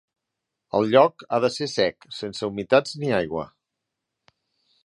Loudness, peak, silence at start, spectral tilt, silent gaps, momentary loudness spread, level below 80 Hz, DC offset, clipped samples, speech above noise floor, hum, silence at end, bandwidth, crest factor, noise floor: -23 LUFS; -2 dBFS; 0.75 s; -5 dB/octave; none; 14 LU; -60 dBFS; under 0.1%; under 0.1%; 61 dB; none; 1.4 s; 11 kHz; 22 dB; -83 dBFS